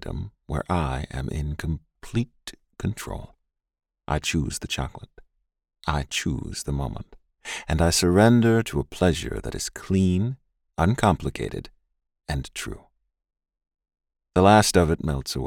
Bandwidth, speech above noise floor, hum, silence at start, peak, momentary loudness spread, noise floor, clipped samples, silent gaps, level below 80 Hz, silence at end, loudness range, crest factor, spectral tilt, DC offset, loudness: 17 kHz; 38 dB; none; 0 s; -4 dBFS; 18 LU; -62 dBFS; under 0.1%; none; -40 dBFS; 0 s; 9 LU; 22 dB; -5 dB/octave; under 0.1%; -24 LUFS